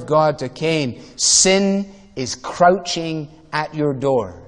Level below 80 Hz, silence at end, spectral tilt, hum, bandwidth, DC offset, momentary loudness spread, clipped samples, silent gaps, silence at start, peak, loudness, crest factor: -50 dBFS; 0 s; -3 dB/octave; none; 10.5 kHz; 0.2%; 14 LU; under 0.1%; none; 0 s; 0 dBFS; -18 LUFS; 18 dB